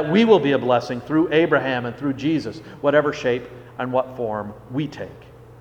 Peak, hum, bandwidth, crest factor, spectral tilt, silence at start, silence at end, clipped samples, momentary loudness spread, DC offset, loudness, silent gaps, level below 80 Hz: -2 dBFS; none; 9.2 kHz; 18 dB; -7 dB/octave; 0 s; 0 s; under 0.1%; 14 LU; under 0.1%; -21 LUFS; none; -54 dBFS